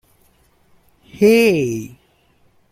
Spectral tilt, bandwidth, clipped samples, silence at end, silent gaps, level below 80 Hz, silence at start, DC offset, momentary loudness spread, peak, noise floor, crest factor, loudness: -5.5 dB/octave; 16 kHz; under 0.1%; 0.85 s; none; -56 dBFS; 1.15 s; under 0.1%; 17 LU; -2 dBFS; -57 dBFS; 18 dB; -15 LUFS